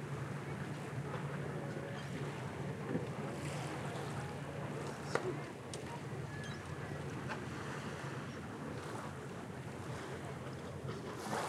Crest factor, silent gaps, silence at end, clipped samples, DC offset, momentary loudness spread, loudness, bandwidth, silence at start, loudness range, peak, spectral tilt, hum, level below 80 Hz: 26 dB; none; 0 s; under 0.1%; under 0.1%; 5 LU; -43 LUFS; 15 kHz; 0 s; 3 LU; -16 dBFS; -6 dB/octave; none; -70 dBFS